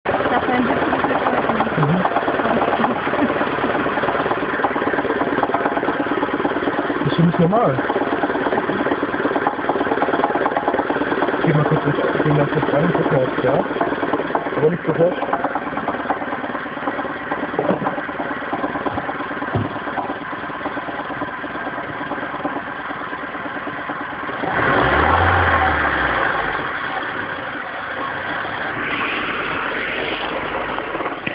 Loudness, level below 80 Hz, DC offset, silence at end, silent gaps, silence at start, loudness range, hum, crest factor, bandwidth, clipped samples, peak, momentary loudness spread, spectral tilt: -20 LUFS; -44 dBFS; under 0.1%; 0 s; none; 0.05 s; 7 LU; none; 18 dB; 5.2 kHz; under 0.1%; -2 dBFS; 9 LU; -11 dB/octave